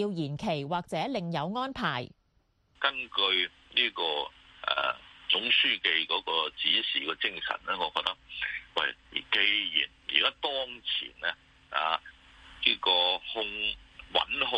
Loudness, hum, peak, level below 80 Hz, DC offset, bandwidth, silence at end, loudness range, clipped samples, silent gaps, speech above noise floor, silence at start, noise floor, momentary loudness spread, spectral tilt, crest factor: -29 LUFS; none; -8 dBFS; -62 dBFS; under 0.1%; 11.5 kHz; 0 s; 3 LU; under 0.1%; none; 40 dB; 0 s; -70 dBFS; 10 LU; -4.5 dB/octave; 24 dB